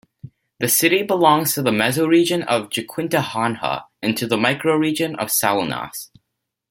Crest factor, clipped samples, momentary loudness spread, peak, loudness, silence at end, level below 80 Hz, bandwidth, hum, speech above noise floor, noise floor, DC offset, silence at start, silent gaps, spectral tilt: 18 dB; under 0.1%; 10 LU; -2 dBFS; -19 LUFS; 0.65 s; -60 dBFS; 17 kHz; none; 59 dB; -78 dBFS; under 0.1%; 0.25 s; none; -3.5 dB/octave